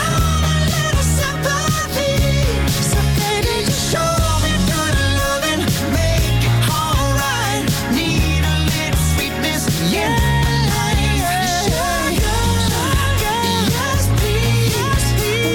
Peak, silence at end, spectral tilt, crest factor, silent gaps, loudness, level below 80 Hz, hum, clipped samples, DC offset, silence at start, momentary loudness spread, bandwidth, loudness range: -6 dBFS; 0 s; -4.5 dB/octave; 10 dB; none; -17 LUFS; -24 dBFS; none; under 0.1%; under 0.1%; 0 s; 2 LU; 19.5 kHz; 0 LU